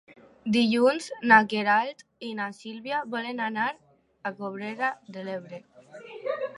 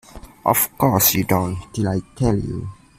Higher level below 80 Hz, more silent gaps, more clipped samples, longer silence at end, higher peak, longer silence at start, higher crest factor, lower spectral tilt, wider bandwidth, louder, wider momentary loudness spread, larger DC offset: second, -74 dBFS vs -42 dBFS; neither; neither; second, 0 s vs 0.25 s; about the same, -4 dBFS vs -2 dBFS; about the same, 0.1 s vs 0.15 s; first, 24 dB vs 18 dB; about the same, -5 dB/octave vs -4.5 dB/octave; second, 11.5 kHz vs 16 kHz; second, -26 LUFS vs -19 LUFS; first, 20 LU vs 10 LU; neither